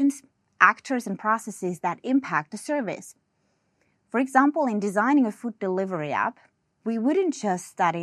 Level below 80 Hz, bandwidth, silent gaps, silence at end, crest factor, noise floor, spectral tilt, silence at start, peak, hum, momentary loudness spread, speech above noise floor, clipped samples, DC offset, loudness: -80 dBFS; 13 kHz; none; 0 s; 22 dB; -71 dBFS; -5.5 dB/octave; 0 s; -2 dBFS; none; 11 LU; 47 dB; under 0.1%; under 0.1%; -25 LUFS